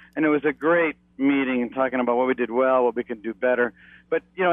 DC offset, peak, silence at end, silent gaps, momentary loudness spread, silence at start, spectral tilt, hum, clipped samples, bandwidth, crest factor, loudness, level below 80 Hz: under 0.1%; -10 dBFS; 0 s; none; 8 LU; 0.15 s; -8.5 dB/octave; none; under 0.1%; 3.8 kHz; 14 dB; -23 LUFS; -62 dBFS